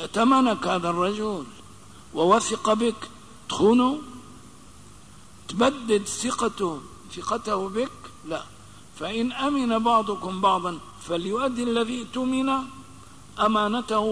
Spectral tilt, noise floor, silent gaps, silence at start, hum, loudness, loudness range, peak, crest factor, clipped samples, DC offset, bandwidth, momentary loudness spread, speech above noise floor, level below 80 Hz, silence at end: -4.5 dB/octave; -49 dBFS; none; 0 s; none; -24 LUFS; 4 LU; -8 dBFS; 18 dB; under 0.1%; 0.3%; 11 kHz; 18 LU; 25 dB; -56 dBFS; 0 s